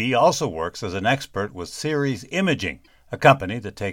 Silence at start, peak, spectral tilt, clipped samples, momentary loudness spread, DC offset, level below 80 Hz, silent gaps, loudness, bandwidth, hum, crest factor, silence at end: 0 s; 0 dBFS; -5 dB/octave; under 0.1%; 13 LU; under 0.1%; -52 dBFS; none; -22 LUFS; 16.5 kHz; none; 22 dB; 0 s